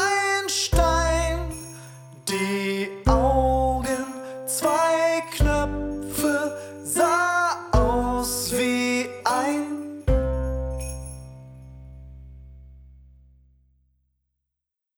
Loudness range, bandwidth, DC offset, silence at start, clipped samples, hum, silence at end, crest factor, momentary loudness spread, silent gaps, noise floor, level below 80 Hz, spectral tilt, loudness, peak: 8 LU; 19.5 kHz; under 0.1%; 0 s; under 0.1%; none; 2.15 s; 20 dB; 19 LU; none; -85 dBFS; -32 dBFS; -4.5 dB/octave; -24 LUFS; -6 dBFS